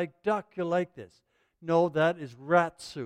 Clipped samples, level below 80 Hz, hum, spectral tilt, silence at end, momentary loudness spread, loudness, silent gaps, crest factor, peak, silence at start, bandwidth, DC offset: under 0.1%; -72 dBFS; none; -6.5 dB/octave; 0 s; 13 LU; -28 LUFS; none; 20 dB; -10 dBFS; 0 s; 10.5 kHz; under 0.1%